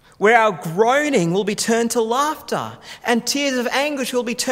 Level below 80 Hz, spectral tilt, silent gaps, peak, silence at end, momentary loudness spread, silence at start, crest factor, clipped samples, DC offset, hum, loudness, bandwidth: -62 dBFS; -3.5 dB/octave; none; 0 dBFS; 0 s; 9 LU; 0.2 s; 18 dB; under 0.1%; under 0.1%; none; -19 LUFS; 16 kHz